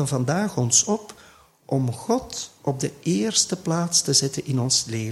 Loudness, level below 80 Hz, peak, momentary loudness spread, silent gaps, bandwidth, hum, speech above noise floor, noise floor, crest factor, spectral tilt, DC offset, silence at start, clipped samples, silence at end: -22 LUFS; -58 dBFS; -4 dBFS; 10 LU; none; 14.5 kHz; none; 29 dB; -52 dBFS; 18 dB; -3.5 dB/octave; under 0.1%; 0 s; under 0.1%; 0 s